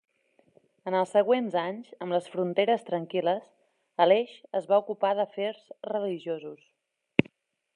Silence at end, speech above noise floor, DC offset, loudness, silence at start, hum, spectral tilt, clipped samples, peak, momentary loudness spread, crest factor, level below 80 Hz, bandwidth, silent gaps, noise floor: 0.55 s; 37 dB; under 0.1%; -28 LUFS; 0.85 s; none; -6.5 dB/octave; under 0.1%; -2 dBFS; 13 LU; 26 dB; -72 dBFS; 10.5 kHz; none; -64 dBFS